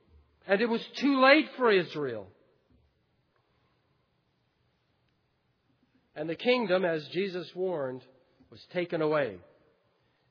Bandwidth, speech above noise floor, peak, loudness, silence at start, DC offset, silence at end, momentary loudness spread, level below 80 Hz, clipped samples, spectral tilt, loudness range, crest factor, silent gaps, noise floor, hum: 5.4 kHz; 46 dB; -8 dBFS; -28 LUFS; 0.45 s; under 0.1%; 0.9 s; 15 LU; -76 dBFS; under 0.1%; -6 dB/octave; 12 LU; 24 dB; none; -74 dBFS; none